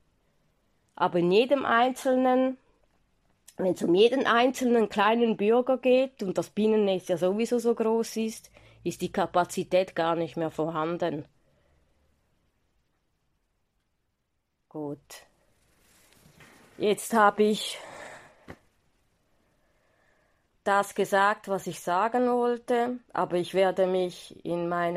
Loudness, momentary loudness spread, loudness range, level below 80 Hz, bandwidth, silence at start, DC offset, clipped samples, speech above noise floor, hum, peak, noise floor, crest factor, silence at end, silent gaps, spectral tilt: -26 LUFS; 12 LU; 18 LU; -68 dBFS; 15.5 kHz; 1 s; under 0.1%; under 0.1%; 52 dB; none; -8 dBFS; -78 dBFS; 20 dB; 0 s; none; -5 dB/octave